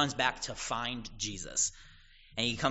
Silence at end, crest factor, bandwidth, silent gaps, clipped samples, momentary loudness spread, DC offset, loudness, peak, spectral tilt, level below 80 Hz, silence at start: 0 s; 24 dB; 8 kHz; none; under 0.1%; 7 LU; under 0.1%; -33 LUFS; -12 dBFS; -2 dB/octave; -54 dBFS; 0 s